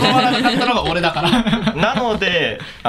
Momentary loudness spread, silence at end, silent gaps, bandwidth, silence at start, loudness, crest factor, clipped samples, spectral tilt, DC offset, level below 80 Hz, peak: 4 LU; 0 s; none; 14 kHz; 0 s; -16 LUFS; 16 dB; under 0.1%; -5 dB/octave; under 0.1%; -38 dBFS; 0 dBFS